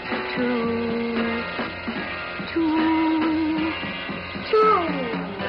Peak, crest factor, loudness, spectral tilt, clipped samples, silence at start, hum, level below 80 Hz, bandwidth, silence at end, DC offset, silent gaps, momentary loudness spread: -10 dBFS; 14 dB; -23 LUFS; -8 dB/octave; under 0.1%; 0 s; none; -52 dBFS; 5.6 kHz; 0 s; under 0.1%; none; 10 LU